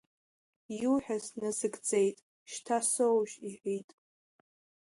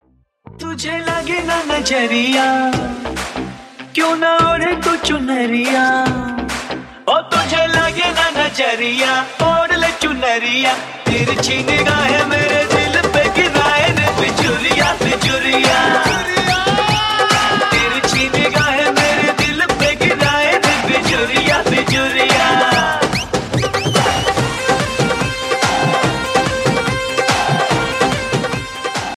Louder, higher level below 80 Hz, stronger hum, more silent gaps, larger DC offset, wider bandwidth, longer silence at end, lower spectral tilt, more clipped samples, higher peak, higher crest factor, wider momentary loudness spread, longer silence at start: second, -32 LUFS vs -14 LUFS; second, -76 dBFS vs -38 dBFS; neither; first, 2.22-2.46 s vs none; neither; second, 11.5 kHz vs 15.5 kHz; first, 1.05 s vs 0 s; about the same, -4 dB/octave vs -3.5 dB/octave; neither; second, -18 dBFS vs 0 dBFS; about the same, 16 dB vs 16 dB; first, 15 LU vs 7 LU; first, 0.7 s vs 0.55 s